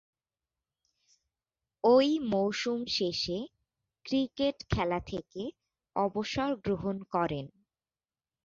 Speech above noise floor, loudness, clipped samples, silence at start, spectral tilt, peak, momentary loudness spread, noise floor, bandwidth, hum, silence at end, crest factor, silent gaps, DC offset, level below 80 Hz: over 60 dB; -31 LUFS; under 0.1%; 1.85 s; -5.5 dB/octave; -12 dBFS; 15 LU; under -90 dBFS; 7.6 kHz; none; 1 s; 20 dB; none; under 0.1%; -54 dBFS